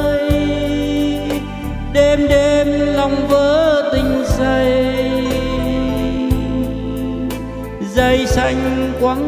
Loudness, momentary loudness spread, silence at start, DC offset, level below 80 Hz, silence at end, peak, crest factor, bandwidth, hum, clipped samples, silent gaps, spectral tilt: -16 LUFS; 9 LU; 0 s; under 0.1%; -26 dBFS; 0 s; 0 dBFS; 16 dB; 16 kHz; none; under 0.1%; none; -6 dB/octave